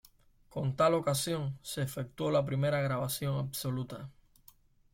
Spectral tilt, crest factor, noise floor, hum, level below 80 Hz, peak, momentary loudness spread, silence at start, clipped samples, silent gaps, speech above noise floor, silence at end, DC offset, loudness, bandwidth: -5.5 dB/octave; 18 dB; -63 dBFS; none; -62 dBFS; -16 dBFS; 11 LU; 0.5 s; under 0.1%; none; 30 dB; 0.85 s; under 0.1%; -33 LUFS; 16.5 kHz